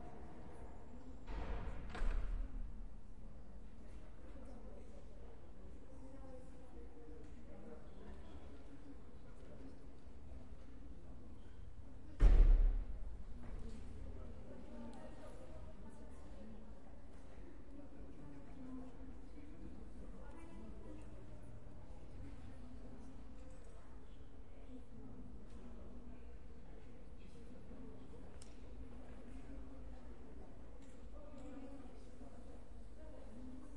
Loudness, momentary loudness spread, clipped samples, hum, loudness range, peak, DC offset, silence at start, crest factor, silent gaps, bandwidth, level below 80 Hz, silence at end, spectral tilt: -51 LUFS; 10 LU; under 0.1%; none; 17 LU; -18 dBFS; 0.4%; 0 s; 26 dB; none; 5.6 kHz; -44 dBFS; 0 s; -7.5 dB/octave